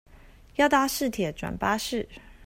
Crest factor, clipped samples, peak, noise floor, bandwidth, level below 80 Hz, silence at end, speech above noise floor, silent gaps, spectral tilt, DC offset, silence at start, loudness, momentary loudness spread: 20 dB; under 0.1%; -8 dBFS; -51 dBFS; 16 kHz; -50 dBFS; 0 s; 25 dB; none; -4 dB/octave; under 0.1%; 0.6 s; -26 LUFS; 12 LU